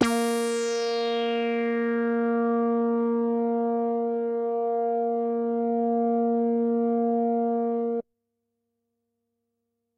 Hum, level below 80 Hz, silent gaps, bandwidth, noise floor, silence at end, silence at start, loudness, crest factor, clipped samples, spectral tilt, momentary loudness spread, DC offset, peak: none; -70 dBFS; none; 13.5 kHz; -80 dBFS; 1.95 s; 0 s; -26 LUFS; 18 dB; under 0.1%; -5 dB/octave; 3 LU; under 0.1%; -8 dBFS